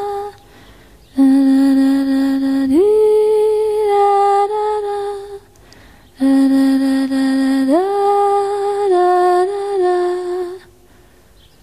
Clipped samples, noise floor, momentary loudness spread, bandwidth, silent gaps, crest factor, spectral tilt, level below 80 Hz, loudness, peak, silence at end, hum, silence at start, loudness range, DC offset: under 0.1%; -48 dBFS; 12 LU; 15 kHz; none; 12 dB; -5 dB/octave; -52 dBFS; -14 LUFS; -4 dBFS; 1.05 s; none; 0 s; 3 LU; 0.2%